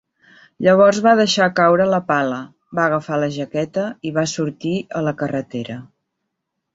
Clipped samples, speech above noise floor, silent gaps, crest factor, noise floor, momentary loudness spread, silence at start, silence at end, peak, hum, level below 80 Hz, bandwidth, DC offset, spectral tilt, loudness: under 0.1%; 59 dB; none; 18 dB; -77 dBFS; 14 LU; 0.6 s; 0.9 s; -2 dBFS; none; -60 dBFS; 8 kHz; under 0.1%; -5 dB/octave; -18 LUFS